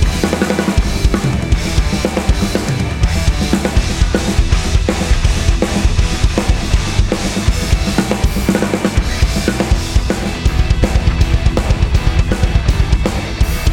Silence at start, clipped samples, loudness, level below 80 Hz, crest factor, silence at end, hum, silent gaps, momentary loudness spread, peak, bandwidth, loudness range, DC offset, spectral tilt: 0 s; under 0.1%; -16 LUFS; -16 dBFS; 14 dB; 0 s; none; none; 2 LU; 0 dBFS; 16.5 kHz; 1 LU; under 0.1%; -5.5 dB/octave